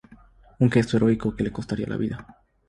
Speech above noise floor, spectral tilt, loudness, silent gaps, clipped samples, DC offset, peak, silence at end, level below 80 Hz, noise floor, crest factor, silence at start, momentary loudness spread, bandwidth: 29 dB; -7.5 dB/octave; -24 LUFS; none; under 0.1%; under 0.1%; -6 dBFS; 0.45 s; -48 dBFS; -52 dBFS; 20 dB; 0.1 s; 10 LU; 11 kHz